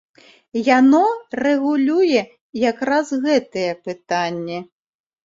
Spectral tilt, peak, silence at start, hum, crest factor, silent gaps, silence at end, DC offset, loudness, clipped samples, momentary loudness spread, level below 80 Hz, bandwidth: -5 dB/octave; -2 dBFS; 0.55 s; none; 18 dB; 2.41-2.53 s; 0.6 s; under 0.1%; -18 LUFS; under 0.1%; 14 LU; -64 dBFS; 7.8 kHz